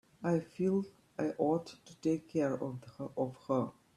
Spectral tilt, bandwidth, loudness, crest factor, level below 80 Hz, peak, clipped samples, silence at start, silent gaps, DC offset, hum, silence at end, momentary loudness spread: -8 dB/octave; 12.5 kHz; -36 LUFS; 18 dB; -74 dBFS; -18 dBFS; under 0.1%; 0.2 s; none; under 0.1%; none; 0.25 s; 10 LU